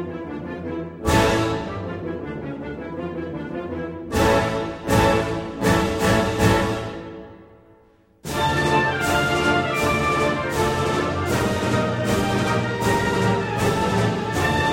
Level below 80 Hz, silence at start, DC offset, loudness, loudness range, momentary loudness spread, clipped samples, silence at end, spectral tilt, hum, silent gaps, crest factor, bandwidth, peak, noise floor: -38 dBFS; 0 s; under 0.1%; -22 LUFS; 5 LU; 12 LU; under 0.1%; 0 s; -5 dB/octave; none; none; 18 dB; 16.5 kHz; -4 dBFS; -55 dBFS